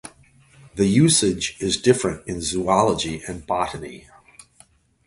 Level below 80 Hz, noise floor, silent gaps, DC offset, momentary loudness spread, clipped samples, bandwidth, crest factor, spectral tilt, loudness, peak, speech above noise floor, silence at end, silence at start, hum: -46 dBFS; -56 dBFS; none; under 0.1%; 14 LU; under 0.1%; 11.5 kHz; 20 dB; -4.5 dB/octave; -21 LUFS; -2 dBFS; 35 dB; 1.1 s; 0.05 s; none